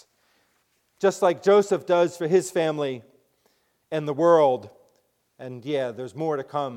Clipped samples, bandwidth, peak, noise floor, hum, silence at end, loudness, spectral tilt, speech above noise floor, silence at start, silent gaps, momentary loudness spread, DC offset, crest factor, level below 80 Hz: under 0.1%; 15.5 kHz; -6 dBFS; -69 dBFS; none; 0 s; -23 LUFS; -5.5 dB/octave; 47 dB; 1 s; none; 13 LU; under 0.1%; 18 dB; -76 dBFS